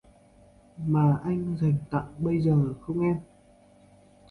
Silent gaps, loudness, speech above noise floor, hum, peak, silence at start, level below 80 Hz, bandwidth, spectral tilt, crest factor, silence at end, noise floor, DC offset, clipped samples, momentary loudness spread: none; -27 LUFS; 32 dB; none; -12 dBFS; 0.75 s; -54 dBFS; 4.5 kHz; -10.5 dB/octave; 16 dB; 1.05 s; -57 dBFS; under 0.1%; under 0.1%; 7 LU